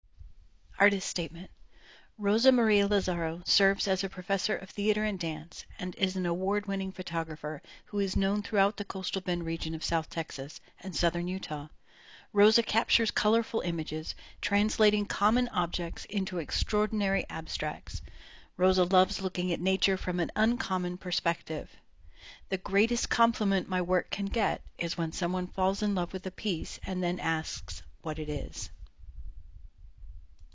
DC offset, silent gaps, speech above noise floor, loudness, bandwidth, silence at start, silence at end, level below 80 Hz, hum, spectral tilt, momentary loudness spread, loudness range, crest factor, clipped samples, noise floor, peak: 0.1%; none; 26 dB; -30 LUFS; 7.8 kHz; 0.2 s; 0 s; -48 dBFS; none; -4.5 dB/octave; 13 LU; 5 LU; 22 dB; under 0.1%; -56 dBFS; -10 dBFS